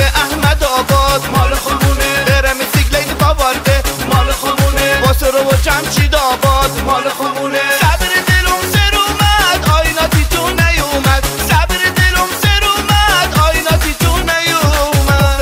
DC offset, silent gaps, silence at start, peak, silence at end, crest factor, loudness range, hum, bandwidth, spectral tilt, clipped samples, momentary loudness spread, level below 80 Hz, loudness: under 0.1%; none; 0 s; 0 dBFS; 0 s; 12 dB; 1 LU; none; 16.5 kHz; -4 dB/octave; under 0.1%; 3 LU; -18 dBFS; -12 LUFS